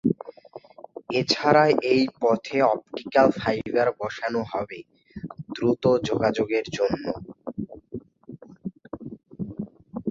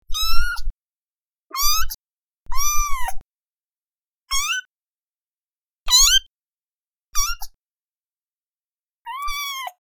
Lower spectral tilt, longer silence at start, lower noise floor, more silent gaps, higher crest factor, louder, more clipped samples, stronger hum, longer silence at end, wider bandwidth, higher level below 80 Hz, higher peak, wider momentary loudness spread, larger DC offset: first, -6 dB/octave vs 2 dB/octave; about the same, 0.05 s vs 0.1 s; second, -46 dBFS vs under -90 dBFS; second, none vs 0.70-1.47 s, 1.94-2.46 s, 3.21-4.26 s, 4.65-5.86 s, 6.26-7.13 s, 7.54-9.05 s; about the same, 20 dB vs 20 dB; second, -24 LUFS vs -20 LUFS; neither; neither; about the same, 0 s vs 0.1 s; second, 7.8 kHz vs over 20 kHz; second, -58 dBFS vs -30 dBFS; about the same, -4 dBFS vs -2 dBFS; about the same, 20 LU vs 21 LU; neither